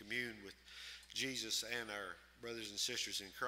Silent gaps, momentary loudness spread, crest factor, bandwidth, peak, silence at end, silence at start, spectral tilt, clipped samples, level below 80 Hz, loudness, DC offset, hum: none; 13 LU; 20 dB; 16 kHz; -26 dBFS; 0 s; 0 s; -1 dB/octave; under 0.1%; -72 dBFS; -43 LUFS; under 0.1%; none